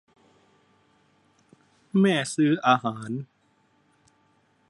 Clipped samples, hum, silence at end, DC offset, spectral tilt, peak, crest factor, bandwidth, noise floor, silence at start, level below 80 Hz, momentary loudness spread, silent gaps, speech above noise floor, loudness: under 0.1%; none; 1.45 s; under 0.1%; -5.5 dB/octave; -6 dBFS; 22 dB; 11.5 kHz; -66 dBFS; 1.95 s; -74 dBFS; 14 LU; none; 43 dB; -24 LUFS